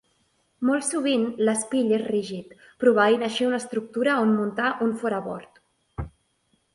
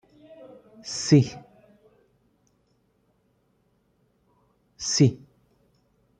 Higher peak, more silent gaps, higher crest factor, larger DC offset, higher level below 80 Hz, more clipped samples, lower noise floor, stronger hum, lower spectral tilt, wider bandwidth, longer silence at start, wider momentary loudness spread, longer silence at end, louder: about the same, -6 dBFS vs -6 dBFS; neither; second, 18 dB vs 24 dB; neither; first, -52 dBFS vs -64 dBFS; neither; about the same, -69 dBFS vs -68 dBFS; neither; about the same, -4.5 dB/octave vs -5.5 dB/octave; first, 11.5 kHz vs 9.4 kHz; second, 0.6 s vs 0.85 s; second, 17 LU vs 28 LU; second, 0.65 s vs 1.05 s; about the same, -24 LUFS vs -23 LUFS